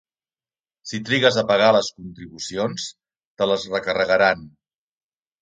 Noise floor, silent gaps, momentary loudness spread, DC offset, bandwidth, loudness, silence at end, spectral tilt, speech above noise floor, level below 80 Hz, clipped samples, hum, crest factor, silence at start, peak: under -90 dBFS; 3.25-3.35 s; 16 LU; under 0.1%; 9.4 kHz; -20 LUFS; 0.95 s; -4 dB/octave; over 70 dB; -58 dBFS; under 0.1%; none; 22 dB; 0.85 s; -2 dBFS